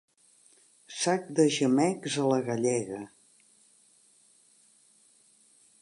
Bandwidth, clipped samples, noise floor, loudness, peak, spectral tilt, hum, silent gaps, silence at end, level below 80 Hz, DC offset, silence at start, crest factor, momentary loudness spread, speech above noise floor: 11.5 kHz; under 0.1%; -63 dBFS; -27 LUFS; -12 dBFS; -4.5 dB/octave; none; none; 2.75 s; -78 dBFS; under 0.1%; 0.9 s; 20 dB; 16 LU; 36 dB